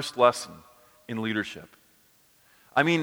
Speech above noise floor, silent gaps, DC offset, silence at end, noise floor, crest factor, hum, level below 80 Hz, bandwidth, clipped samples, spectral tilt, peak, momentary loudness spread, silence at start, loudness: 36 dB; none; under 0.1%; 0 s; -62 dBFS; 24 dB; none; -70 dBFS; over 20 kHz; under 0.1%; -4.5 dB/octave; -6 dBFS; 17 LU; 0 s; -27 LUFS